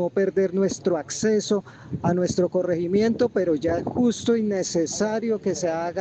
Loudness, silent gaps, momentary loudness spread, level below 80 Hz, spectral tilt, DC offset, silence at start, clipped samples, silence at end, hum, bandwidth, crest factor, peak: -23 LUFS; none; 4 LU; -58 dBFS; -5.5 dB/octave; under 0.1%; 0 s; under 0.1%; 0 s; none; 8.8 kHz; 14 dB; -8 dBFS